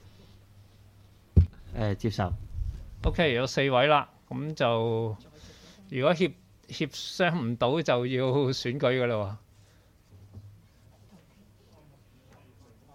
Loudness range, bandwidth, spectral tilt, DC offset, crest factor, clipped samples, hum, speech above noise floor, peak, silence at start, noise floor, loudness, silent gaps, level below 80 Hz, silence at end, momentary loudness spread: 5 LU; 14 kHz; -6 dB/octave; under 0.1%; 22 dB; under 0.1%; none; 32 dB; -6 dBFS; 1.35 s; -59 dBFS; -28 LUFS; none; -40 dBFS; 1.8 s; 12 LU